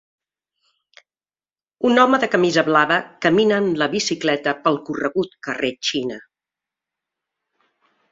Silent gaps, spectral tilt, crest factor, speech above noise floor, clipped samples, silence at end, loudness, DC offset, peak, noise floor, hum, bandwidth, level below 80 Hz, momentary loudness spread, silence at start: none; -4 dB/octave; 20 dB; over 71 dB; under 0.1%; 1.9 s; -19 LUFS; under 0.1%; -2 dBFS; under -90 dBFS; none; 7.8 kHz; -64 dBFS; 9 LU; 1.8 s